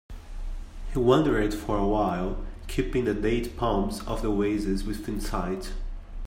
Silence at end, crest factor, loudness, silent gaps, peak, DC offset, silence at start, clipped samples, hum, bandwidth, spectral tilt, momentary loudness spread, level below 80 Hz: 0 s; 20 dB; -27 LUFS; none; -8 dBFS; under 0.1%; 0.1 s; under 0.1%; none; 16 kHz; -6.5 dB/octave; 19 LU; -34 dBFS